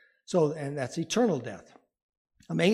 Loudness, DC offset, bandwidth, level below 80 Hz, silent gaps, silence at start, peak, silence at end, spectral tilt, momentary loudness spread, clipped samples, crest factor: -29 LUFS; under 0.1%; 14 kHz; -72 dBFS; 2.02-2.25 s; 0.3 s; -12 dBFS; 0 s; -5.5 dB/octave; 11 LU; under 0.1%; 18 dB